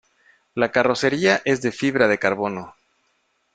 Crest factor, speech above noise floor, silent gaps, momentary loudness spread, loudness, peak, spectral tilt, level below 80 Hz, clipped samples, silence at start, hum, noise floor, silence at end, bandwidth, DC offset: 20 dB; 48 dB; none; 9 LU; -20 LUFS; -2 dBFS; -5 dB/octave; -60 dBFS; under 0.1%; 0.55 s; none; -68 dBFS; 0.85 s; 9.2 kHz; under 0.1%